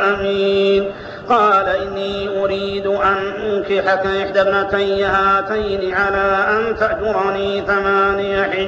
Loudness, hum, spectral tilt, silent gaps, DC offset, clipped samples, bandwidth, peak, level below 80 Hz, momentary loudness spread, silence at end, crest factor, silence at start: -17 LUFS; none; -2.5 dB/octave; none; under 0.1%; under 0.1%; 7.6 kHz; -4 dBFS; -42 dBFS; 6 LU; 0 s; 12 dB; 0 s